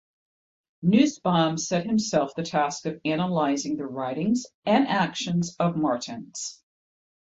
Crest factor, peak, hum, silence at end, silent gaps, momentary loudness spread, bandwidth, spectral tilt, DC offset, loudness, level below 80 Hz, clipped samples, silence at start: 18 dB; -8 dBFS; none; 0.85 s; 4.54-4.62 s; 9 LU; 8 kHz; -5 dB/octave; under 0.1%; -25 LUFS; -64 dBFS; under 0.1%; 0.8 s